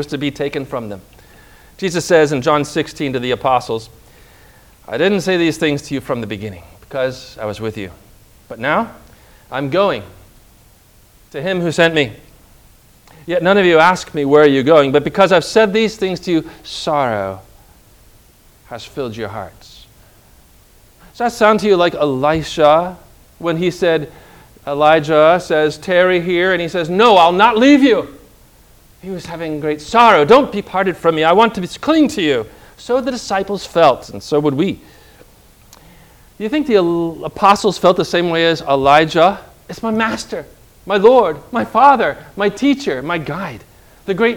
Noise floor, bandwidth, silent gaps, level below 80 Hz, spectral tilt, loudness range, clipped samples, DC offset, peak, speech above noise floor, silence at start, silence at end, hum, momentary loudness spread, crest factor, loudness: -48 dBFS; 19.5 kHz; none; -46 dBFS; -5 dB/octave; 9 LU; 0.1%; under 0.1%; 0 dBFS; 33 dB; 0 s; 0 s; none; 16 LU; 16 dB; -14 LUFS